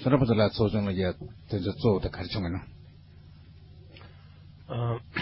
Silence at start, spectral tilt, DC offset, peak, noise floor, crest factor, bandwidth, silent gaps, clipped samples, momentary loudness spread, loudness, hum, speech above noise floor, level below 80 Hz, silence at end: 0 s; -11 dB/octave; under 0.1%; -8 dBFS; -51 dBFS; 20 dB; 5.8 kHz; none; under 0.1%; 25 LU; -28 LUFS; none; 23 dB; -46 dBFS; 0 s